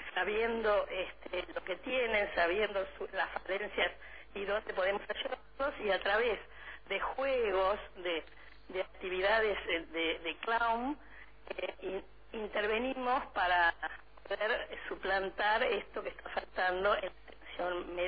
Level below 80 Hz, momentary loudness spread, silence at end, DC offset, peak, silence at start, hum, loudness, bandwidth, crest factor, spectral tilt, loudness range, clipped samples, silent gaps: -58 dBFS; 12 LU; 0 s; 0.2%; -18 dBFS; 0 s; none; -34 LUFS; 5 kHz; 18 dB; -6.5 dB/octave; 2 LU; under 0.1%; none